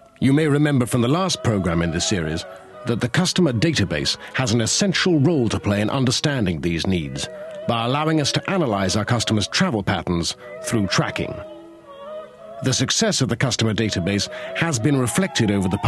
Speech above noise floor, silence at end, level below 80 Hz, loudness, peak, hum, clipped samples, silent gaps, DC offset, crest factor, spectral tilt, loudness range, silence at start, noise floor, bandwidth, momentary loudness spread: 20 dB; 0 s; -46 dBFS; -20 LUFS; -4 dBFS; none; under 0.1%; none; under 0.1%; 16 dB; -4.5 dB/octave; 3 LU; 0.2 s; -40 dBFS; 13 kHz; 11 LU